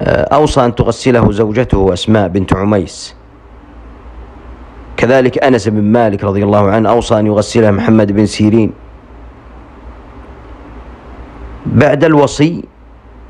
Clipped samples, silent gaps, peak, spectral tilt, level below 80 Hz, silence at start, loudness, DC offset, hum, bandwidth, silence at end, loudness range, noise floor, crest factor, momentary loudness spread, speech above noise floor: 0.5%; none; 0 dBFS; -6.5 dB/octave; -30 dBFS; 0 s; -11 LUFS; under 0.1%; none; 10.5 kHz; 0.05 s; 7 LU; -37 dBFS; 12 dB; 10 LU; 27 dB